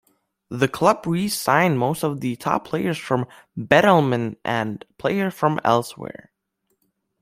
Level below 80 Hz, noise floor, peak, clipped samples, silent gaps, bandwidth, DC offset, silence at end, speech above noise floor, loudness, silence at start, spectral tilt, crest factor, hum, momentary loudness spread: -60 dBFS; -73 dBFS; -2 dBFS; under 0.1%; none; 16 kHz; under 0.1%; 1.15 s; 52 dB; -21 LUFS; 0.5 s; -5.5 dB/octave; 20 dB; none; 14 LU